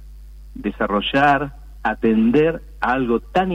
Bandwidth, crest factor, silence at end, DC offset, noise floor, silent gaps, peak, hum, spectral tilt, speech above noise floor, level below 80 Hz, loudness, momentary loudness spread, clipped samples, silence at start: 8.4 kHz; 14 dB; 0 s; under 0.1%; -38 dBFS; none; -6 dBFS; none; -7 dB/octave; 20 dB; -38 dBFS; -19 LUFS; 13 LU; under 0.1%; 0 s